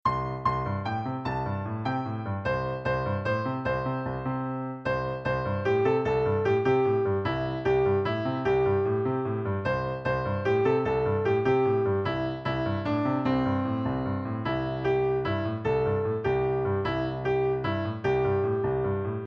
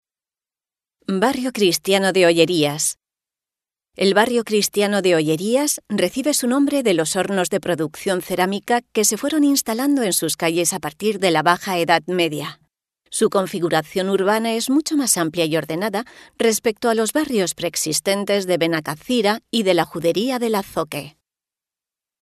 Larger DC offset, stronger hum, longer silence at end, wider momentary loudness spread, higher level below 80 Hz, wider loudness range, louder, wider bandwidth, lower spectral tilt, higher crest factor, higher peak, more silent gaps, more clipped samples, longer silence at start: neither; neither; second, 0 s vs 1.15 s; about the same, 6 LU vs 6 LU; first, -48 dBFS vs -62 dBFS; about the same, 4 LU vs 2 LU; second, -27 LUFS vs -19 LUFS; second, 6.6 kHz vs 13.5 kHz; first, -8.5 dB/octave vs -3.5 dB/octave; about the same, 14 dB vs 18 dB; second, -12 dBFS vs -2 dBFS; neither; neither; second, 0.05 s vs 1.1 s